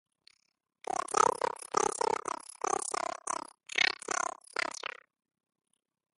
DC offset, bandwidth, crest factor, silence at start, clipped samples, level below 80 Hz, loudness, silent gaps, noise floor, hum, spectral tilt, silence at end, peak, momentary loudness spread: under 0.1%; 12 kHz; 26 dB; 0.9 s; under 0.1%; -74 dBFS; -32 LUFS; none; -67 dBFS; none; -0.5 dB/octave; 1.5 s; -10 dBFS; 12 LU